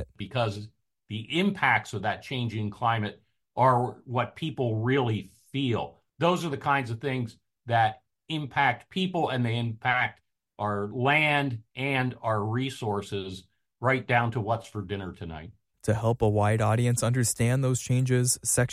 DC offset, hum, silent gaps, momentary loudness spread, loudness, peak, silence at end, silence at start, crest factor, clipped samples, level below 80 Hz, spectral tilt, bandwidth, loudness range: under 0.1%; none; none; 11 LU; -27 LUFS; -10 dBFS; 0 s; 0 s; 18 dB; under 0.1%; -56 dBFS; -5 dB/octave; 15.5 kHz; 3 LU